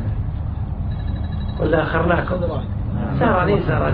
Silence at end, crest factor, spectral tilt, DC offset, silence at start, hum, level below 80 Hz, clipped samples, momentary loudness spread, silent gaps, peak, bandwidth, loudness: 0 s; 16 dB; -11.5 dB/octave; under 0.1%; 0 s; none; -28 dBFS; under 0.1%; 8 LU; none; -4 dBFS; 4.9 kHz; -21 LUFS